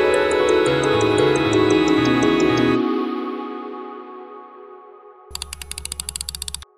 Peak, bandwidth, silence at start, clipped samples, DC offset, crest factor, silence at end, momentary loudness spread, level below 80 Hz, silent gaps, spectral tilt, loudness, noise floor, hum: -4 dBFS; 15 kHz; 0 s; under 0.1%; under 0.1%; 16 dB; 0.15 s; 18 LU; -44 dBFS; none; -4.5 dB/octave; -19 LUFS; -44 dBFS; none